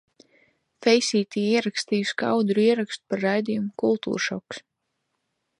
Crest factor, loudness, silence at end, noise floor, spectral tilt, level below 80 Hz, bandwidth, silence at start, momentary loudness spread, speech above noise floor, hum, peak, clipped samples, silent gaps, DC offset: 20 dB; -24 LUFS; 1 s; -78 dBFS; -4.5 dB/octave; -72 dBFS; 11 kHz; 0.8 s; 8 LU; 54 dB; none; -6 dBFS; under 0.1%; none; under 0.1%